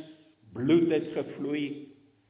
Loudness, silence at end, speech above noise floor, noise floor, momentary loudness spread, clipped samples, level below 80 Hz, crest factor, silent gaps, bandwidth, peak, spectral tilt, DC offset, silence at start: -28 LUFS; 0.4 s; 26 dB; -54 dBFS; 16 LU; under 0.1%; -70 dBFS; 18 dB; none; 4 kHz; -12 dBFS; -6.5 dB/octave; under 0.1%; 0 s